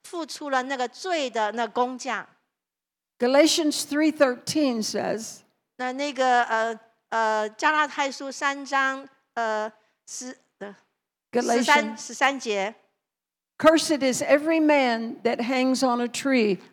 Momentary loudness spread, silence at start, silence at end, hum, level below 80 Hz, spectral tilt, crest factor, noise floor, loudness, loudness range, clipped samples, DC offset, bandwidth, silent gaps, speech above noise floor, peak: 14 LU; 0.05 s; 0.1 s; none; -72 dBFS; -3 dB/octave; 22 dB; -89 dBFS; -24 LUFS; 5 LU; under 0.1%; under 0.1%; 19 kHz; none; 66 dB; -4 dBFS